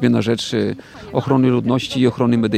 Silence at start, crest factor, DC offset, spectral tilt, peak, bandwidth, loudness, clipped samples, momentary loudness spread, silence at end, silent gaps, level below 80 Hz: 0 s; 16 dB; under 0.1%; -6.5 dB/octave; -2 dBFS; 10.5 kHz; -18 LUFS; under 0.1%; 9 LU; 0 s; none; -52 dBFS